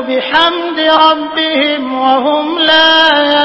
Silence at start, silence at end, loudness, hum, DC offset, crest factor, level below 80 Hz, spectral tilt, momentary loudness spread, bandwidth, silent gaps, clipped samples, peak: 0 s; 0 s; -9 LUFS; none; under 0.1%; 10 dB; -52 dBFS; -3.5 dB/octave; 7 LU; 8 kHz; none; 0.3%; 0 dBFS